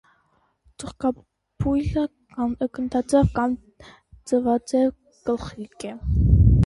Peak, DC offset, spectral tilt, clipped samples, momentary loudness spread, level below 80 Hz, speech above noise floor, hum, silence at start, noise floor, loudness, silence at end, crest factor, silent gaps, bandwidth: -4 dBFS; under 0.1%; -8 dB/octave; under 0.1%; 16 LU; -30 dBFS; 42 dB; none; 0.8 s; -66 dBFS; -23 LUFS; 0 s; 18 dB; none; 11.5 kHz